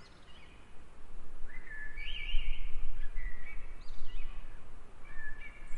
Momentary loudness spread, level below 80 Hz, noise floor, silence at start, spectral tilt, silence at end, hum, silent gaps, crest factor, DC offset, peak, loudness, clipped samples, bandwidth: 16 LU; -38 dBFS; -49 dBFS; 0 s; -4.5 dB/octave; 0 s; none; none; 14 dB; under 0.1%; -14 dBFS; -46 LUFS; under 0.1%; 3.4 kHz